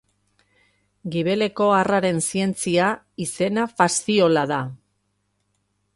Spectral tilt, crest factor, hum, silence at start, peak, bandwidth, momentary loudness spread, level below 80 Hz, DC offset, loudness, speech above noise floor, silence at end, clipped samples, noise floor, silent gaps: -4.5 dB/octave; 20 dB; 50 Hz at -50 dBFS; 1.05 s; -2 dBFS; 11.5 kHz; 11 LU; -62 dBFS; under 0.1%; -21 LUFS; 51 dB; 1.2 s; under 0.1%; -71 dBFS; none